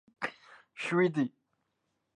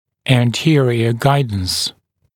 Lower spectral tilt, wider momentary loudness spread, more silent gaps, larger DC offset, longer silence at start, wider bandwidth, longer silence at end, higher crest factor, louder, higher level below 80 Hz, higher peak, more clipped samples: about the same, -6.5 dB/octave vs -5.5 dB/octave; first, 11 LU vs 5 LU; neither; neither; about the same, 0.2 s vs 0.25 s; second, 10 kHz vs 17 kHz; first, 0.9 s vs 0.45 s; about the same, 18 dB vs 16 dB; second, -32 LUFS vs -16 LUFS; second, -82 dBFS vs -46 dBFS; second, -16 dBFS vs 0 dBFS; neither